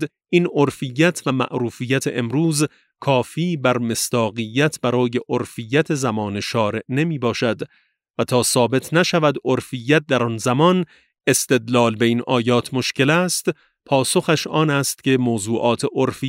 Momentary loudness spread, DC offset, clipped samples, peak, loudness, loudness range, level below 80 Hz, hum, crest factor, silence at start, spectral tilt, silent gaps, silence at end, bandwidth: 6 LU; under 0.1%; under 0.1%; -2 dBFS; -19 LUFS; 3 LU; -62 dBFS; none; 18 dB; 0 s; -4.5 dB/octave; 8.10-8.14 s; 0 s; 16 kHz